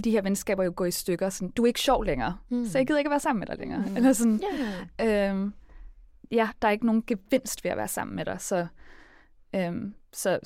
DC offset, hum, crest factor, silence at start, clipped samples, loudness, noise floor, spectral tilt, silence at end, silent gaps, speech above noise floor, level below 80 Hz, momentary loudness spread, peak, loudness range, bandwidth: under 0.1%; none; 16 dB; 0 s; under 0.1%; -27 LUFS; -55 dBFS; -4.5 dB/octave; 0 s; none; 28 dB; -48 dBFS; 8 LU; -10 dBFS; 4 LU; 16.5 kHz